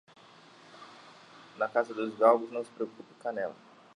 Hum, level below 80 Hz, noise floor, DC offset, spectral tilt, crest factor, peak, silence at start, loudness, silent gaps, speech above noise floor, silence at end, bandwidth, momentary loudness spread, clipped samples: none; -86 dBFS; -56 dBFS; under 0.1%; -5.5 dB/octave; 24 dB; -10 dBFS; 0.75 s; -31 LUFS; none; 26 dB; 0.45 s; 10.5 kHz; 27 LU; under 0.1%